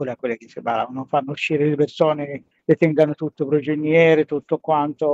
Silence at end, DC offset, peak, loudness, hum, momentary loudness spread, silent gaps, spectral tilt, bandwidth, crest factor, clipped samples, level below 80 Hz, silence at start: 0 s; under 0.1%; -4 dBFS; -20 LUFS; none; 11 LU; none; -7.5 dB/octave; 7.8 kHz; 16 dB; under 0.1%; -66 dBFS; 0 s